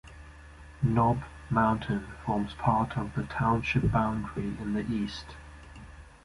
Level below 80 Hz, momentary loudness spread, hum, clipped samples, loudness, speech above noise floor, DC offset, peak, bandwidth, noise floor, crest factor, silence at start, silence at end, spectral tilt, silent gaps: -46 dBFS; 22 LU; none; under 0.1%; -29 LUFS; 21 dB; under 0.1%; -10 dBFS; 11.5 kHz; -49 dBFS; 20 dB; 0.05 s; 0.15 s; -7.5 dB/octave; none